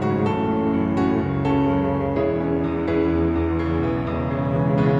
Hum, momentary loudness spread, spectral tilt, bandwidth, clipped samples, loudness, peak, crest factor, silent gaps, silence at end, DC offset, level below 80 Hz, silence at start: none; 3 LU; -9.5 dB/octave; 7.6 kHz; under 0.1%; -22 LUFS; -8 dBFS; 12 dB; none; 0 s; under 0.1%; -36 dBFS; 0 s